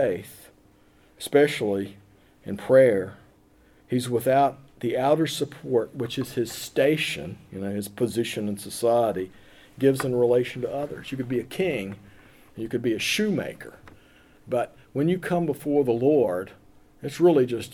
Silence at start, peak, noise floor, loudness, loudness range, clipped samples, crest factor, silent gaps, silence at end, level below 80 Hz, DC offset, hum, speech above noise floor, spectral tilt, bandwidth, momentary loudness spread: 0 s; -8 dBFS; -57 dBFS; -25 LUFS; 4 LU; under 0.1%; 18 dB; none; 0 s; -60 dBFS; under 0.1%; none; 33 dB; -5.5 dB/octave; 19 kHz; 16 LU